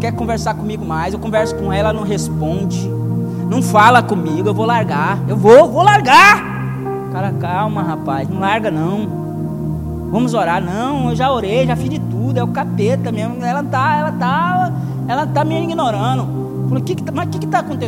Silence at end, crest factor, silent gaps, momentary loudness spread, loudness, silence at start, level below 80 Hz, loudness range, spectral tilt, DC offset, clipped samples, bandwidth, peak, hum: 0 s; 14 dB; none; 12 LU; -15 LUFS; 0 s; -38 dBFS; 7 LU; -6 dB/octave; under 0.1%; 0.3%; 16.5 kHz; 0 dBFS; none